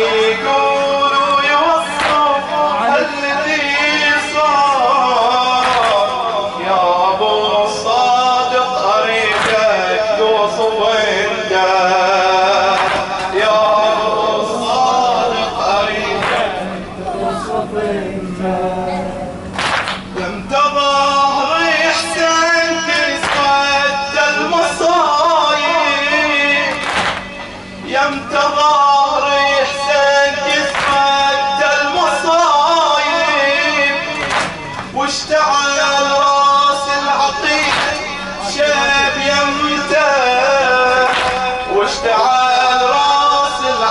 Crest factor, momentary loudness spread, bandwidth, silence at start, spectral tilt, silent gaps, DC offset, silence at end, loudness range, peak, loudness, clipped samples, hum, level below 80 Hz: 12 dB; 7 LU; 11.5 kHz; 0 s; -2.5 dB/octave; none; under 0.1%; 0 s; 3 LU; -2 dBFS; -13 LUFS; under 0.1%; none; -44 dBFS